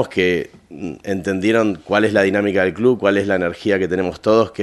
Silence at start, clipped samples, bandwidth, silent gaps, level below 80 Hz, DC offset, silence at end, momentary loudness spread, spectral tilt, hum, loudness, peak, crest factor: 0 s; under 0.1%; 12.5 kHz; none; -46 dBFS; under 0.1%; 0 s; 9 LU; -6 dB/octave; none; -17 LUFS; 0 dBFS; 18 dB